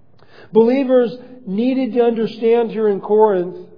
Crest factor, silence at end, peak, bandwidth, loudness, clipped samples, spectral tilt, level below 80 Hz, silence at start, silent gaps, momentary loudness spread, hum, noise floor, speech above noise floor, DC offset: 16 dB; 0.15 s; 0 dBFS; 5.2 kHz; -16 LUFS; under 0.1%; -9 dB/octave; -68 dBFS; 0.55 s; none; 7 LU; none; -46 dBFS; 31 dB; 0.5%